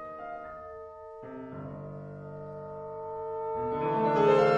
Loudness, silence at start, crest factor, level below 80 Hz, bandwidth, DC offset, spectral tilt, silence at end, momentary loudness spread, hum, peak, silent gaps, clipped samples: -32 LUFS; 0 s; 20 dB; -62 dBFS; 7.6 kHz; under 0.1%; -7.5 dB/octave; 0 s; 19 LU; none; -12 dBFS; none; under 0.1%